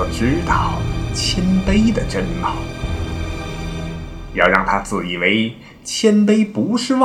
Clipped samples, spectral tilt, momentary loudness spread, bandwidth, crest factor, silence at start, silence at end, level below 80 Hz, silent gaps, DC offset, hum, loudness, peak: under 0.1%; -5 dB/octave; 12 LU; 13 kHz; 18 dB; 0 s; 0 s; -28 dBFS; none; under 0.1%; none; -18 LUFS; 0 dBFS